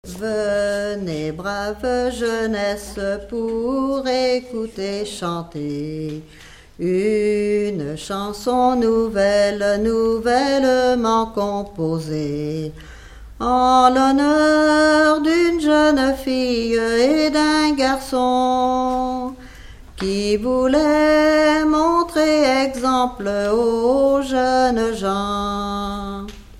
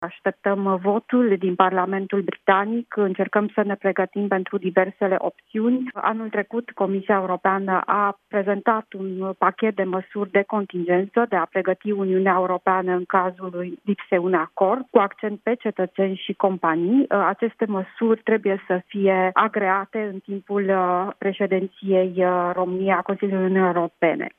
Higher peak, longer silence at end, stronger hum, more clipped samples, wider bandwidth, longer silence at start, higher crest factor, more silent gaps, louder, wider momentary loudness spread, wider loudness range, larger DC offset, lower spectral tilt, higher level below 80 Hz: about the same, 0 dBFS vs 0 dBFS; about the same, 0 s vs 0.1 s; neither; neither; first, 15.5 kHz vs 3.8 kHz; about the same, 0.05 s vs 0 s; about the same, 18 dB vs 22 dB; neither; first, -18 LUFS vs -22 LUFS; first, 11 LU vs 6 LU; first, 7 LU vs 2 LU; neither; second, -5 dB/octave vs -10 dB/octave; first, -42 dBFS vs -76 dBFS